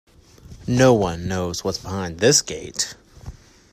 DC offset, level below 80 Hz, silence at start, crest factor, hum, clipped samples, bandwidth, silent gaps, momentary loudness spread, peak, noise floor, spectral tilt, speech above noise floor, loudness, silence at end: under 0.1%; -46 dBFS; 0.5 s; 20 dB; none; under 0.1%; 16 kHz; none; 13 LU; -2 dBFS; -45 dBFS; -4 dB/octave; 25 dB; -20 LUFS; 0.4 s